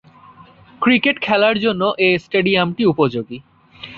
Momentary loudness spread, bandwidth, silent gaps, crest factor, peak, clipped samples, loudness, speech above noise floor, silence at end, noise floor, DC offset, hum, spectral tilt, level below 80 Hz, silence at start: 13 LU; 7 kHz; none; 16 dB; -2 dBFS; under 0.1%; -16 LUFS; 29 dB; 0 s; -45 dBFS; under 0.1%; none; -7.5 dB/octave; -56 dBFS; 0.8 s